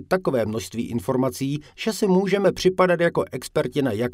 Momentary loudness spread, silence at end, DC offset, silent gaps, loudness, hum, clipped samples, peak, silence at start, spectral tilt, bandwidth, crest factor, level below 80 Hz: 9 LU; 0 s; under 0.1%; none; -23 LUFS; none; under 0.1%; -4 dBFS; 0 s; -6 dB/octave; 16 kHz; 18 dB; -54 dBFS